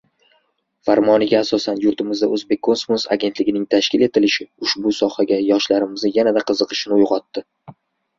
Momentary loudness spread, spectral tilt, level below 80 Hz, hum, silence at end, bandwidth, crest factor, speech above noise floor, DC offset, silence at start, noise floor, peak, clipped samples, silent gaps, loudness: 5 LU; -4.5 dB/octave; -60 dBFS; none; 0.45 s; 7.6 kHz; 16 dB; 47 dB; under 0.1%; 0.85 s; -65 dBFS; -2 dBFS; under 0.1%; none; -18 LUFS